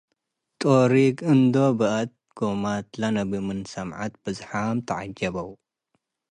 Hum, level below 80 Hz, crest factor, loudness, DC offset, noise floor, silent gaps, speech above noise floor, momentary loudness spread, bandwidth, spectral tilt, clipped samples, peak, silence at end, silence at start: none; -58 dBFS; 18 dB; -24 LUFS; under 0.1%; -78 dBFS; none; 55 dB; 14 LU; 10.5 kHz; -7 dB/octave; under 0.1%; -6 dBFS; 0.8 s; 0.6 s